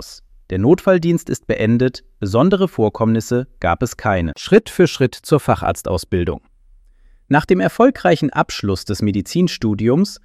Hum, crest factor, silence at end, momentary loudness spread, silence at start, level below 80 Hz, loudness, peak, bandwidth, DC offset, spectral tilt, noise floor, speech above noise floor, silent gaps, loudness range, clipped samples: none; 16 dB; 0.1 s; 7 LU; 0 s; -40 dBFS; -17 LUFS; 0 dBFS; 15.5 kHz; under 0.1%; -6.5 dB/octave; -49 dBFS; 32 dB; none; 1 LU; under 0.1%